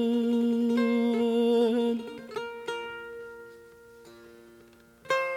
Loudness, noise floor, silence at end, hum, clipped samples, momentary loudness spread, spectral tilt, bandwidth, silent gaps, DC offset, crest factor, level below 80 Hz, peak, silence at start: -27 LUFS; -55 dBFS; 0 s; none; under 0.1%; 18 LU; -5.5 dB/octave; 14 kHz; none; under 0.1%; 14 dB; -72 dBFS; -14 dBFS; 0 s